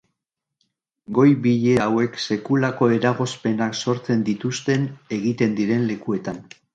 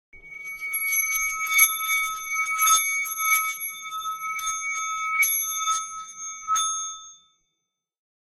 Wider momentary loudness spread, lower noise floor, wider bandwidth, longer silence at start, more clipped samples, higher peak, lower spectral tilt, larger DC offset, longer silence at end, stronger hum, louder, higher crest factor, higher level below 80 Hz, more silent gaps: second, 8 LU vs 15 LU; about the same, -83 dBFS vs -81 dBFS; second, 9.2 kHz vs 16 kHz; first, 1.1 s vs 0.15 s; neither; about the same, -4 dBFS vs -4 dBFS; first, -6.5 dB/octave vs 4.5 dB/octave; neither; second, 0.3 s vs 1.25 s; neither; about the same, -21 LUFS vs -23 LUFS; about the same, 18 dB vs 22 dB; about the same, -58 dBFS vs -62 dBFS; neither